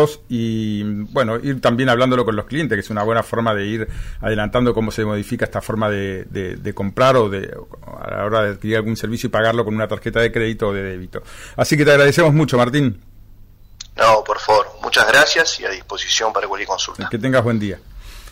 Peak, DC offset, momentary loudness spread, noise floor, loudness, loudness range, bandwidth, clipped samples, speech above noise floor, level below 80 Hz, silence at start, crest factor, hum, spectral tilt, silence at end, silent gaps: -4 dBFS; under 0.1%; 14 LU; -42 dBFS; -18 LUFS; 5 LU; 16 kHz; under 0.1%; 25 dB; -40 dBFS; 0 s; 14 dB; none; -5 dB/octave; 0 s; none